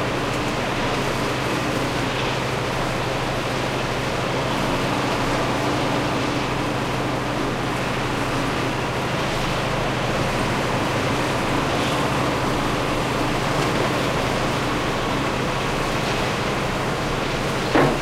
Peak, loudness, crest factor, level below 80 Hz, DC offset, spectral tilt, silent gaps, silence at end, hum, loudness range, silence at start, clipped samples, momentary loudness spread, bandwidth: -6 dBFS; -22 LUFS; 16 dB; -36 dBFS; under 0.1%; -5 dB/octave; none; 0 s; none; 2 LU; 0 s; under 0.1%; 2 LU; 16 kHz